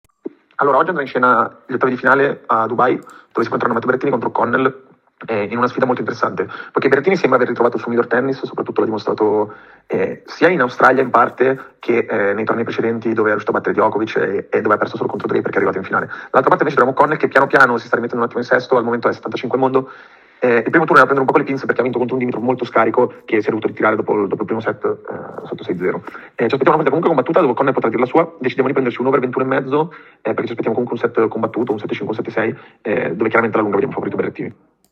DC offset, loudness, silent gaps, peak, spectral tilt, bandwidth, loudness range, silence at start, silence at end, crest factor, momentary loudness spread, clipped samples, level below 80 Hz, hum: under 0.1%; -17 LUFS; none; 0 dBFS; -7.5 dB/octave; 8.6 kHz; 4 LU; 0.25 s; 0.4 s; 16 dB; 9 LU; under 0.1%; -66 dBFS; none